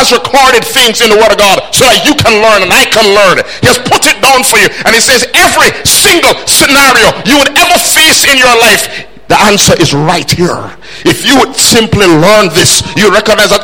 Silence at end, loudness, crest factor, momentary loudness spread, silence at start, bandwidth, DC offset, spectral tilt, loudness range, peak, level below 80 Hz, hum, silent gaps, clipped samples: 0 s; -4 LUFS; 6 dB; 6 LU; 0 s; over 20 kHz; 3%; -2.5 dB/octave; 3 LU; 0 dBFS; -32 dBFS; none; none; 4%